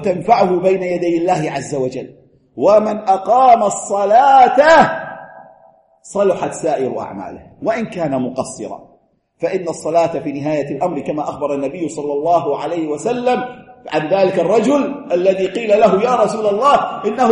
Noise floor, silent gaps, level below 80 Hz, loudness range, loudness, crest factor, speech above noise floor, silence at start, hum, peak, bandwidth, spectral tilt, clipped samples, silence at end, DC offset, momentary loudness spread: -55 dBFS; none; -54 dBFS; 9 LU; -15 LUFS; 16 dB; 40 dB; 0 s; none; 0 dBFS; 11.5 kHz; -5.5 dB/octave; under 0.1%; 0 s; under 0.1%; 14 LU